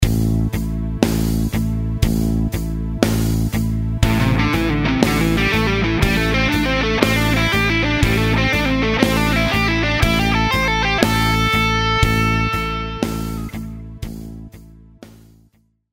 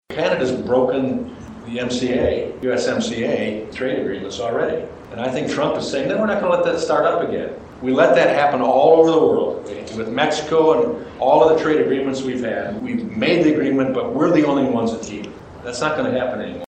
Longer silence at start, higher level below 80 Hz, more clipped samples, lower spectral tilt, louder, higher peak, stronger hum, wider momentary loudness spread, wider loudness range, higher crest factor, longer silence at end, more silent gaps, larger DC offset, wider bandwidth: about the same, 0 s vs 0.1 s; first, -26 dBFS vs -50 dBFS; neither; about the same, -5.5 dB/octave vs -5.5 dB/octave; about the same, -17 LUFS vs -19 LUFS; about the same, 0 dBFS vs 0 dBFS; neither; second, 8 LU vs 13 LU; about the same, 4 LU vs 6 LU; about the same, 18 dB vs 18 dB; first, 0.8 s vs 0.05 s; neither; neither; first, 16.5 kHz vs 9 kHz